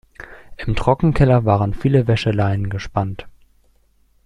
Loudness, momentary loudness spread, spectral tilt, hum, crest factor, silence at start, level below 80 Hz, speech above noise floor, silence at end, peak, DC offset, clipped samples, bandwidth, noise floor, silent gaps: -18 LUFS; 20 LU; -8 dB/octave; none; 16 dB; 0.2 s; -32 dBFS; 41 dB; 0.95 s; -2 dBFS; under 0.1%; under 0.1%; 10 kHz; -57 dBFS; none